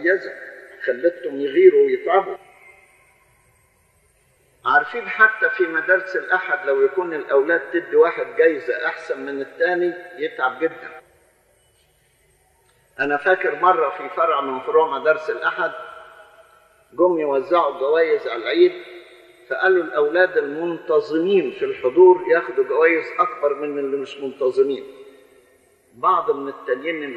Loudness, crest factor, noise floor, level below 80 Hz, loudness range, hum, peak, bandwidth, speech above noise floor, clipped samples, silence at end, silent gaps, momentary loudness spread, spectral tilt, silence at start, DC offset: -19 LUFS; 20 dB; -60 dBFS; -70 dBFS; 7 LU; none; 0 dBFS; 6.6 kHz; 41 dB; under 0.1%; 0 s; none; 12 LU; -6 dB/octave; 0 s; under 0.1%